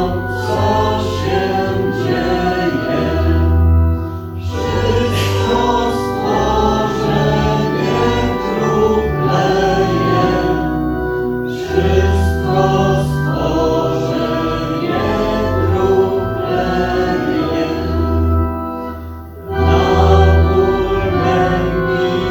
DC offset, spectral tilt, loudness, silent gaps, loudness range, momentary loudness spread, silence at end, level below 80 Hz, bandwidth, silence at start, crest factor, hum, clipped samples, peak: under 0.1%; -7 dB/octave; -15 LUFS; none; 2 LU; 5 LU; 0 s; -24 dBFS; 18.5 kHz; 0 s; 14 dB; none; under 0.1%; 0 dBFS